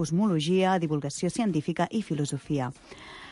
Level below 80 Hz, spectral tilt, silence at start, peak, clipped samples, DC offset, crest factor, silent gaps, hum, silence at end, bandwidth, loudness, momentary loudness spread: -60 dBFS; -6 dB/octave; 0 s; -12 dBFS; under 0.1%; under 0.1%; 14 dB; none; none; 0 s; 11.5 kHz; -28 LUFS; 13 LU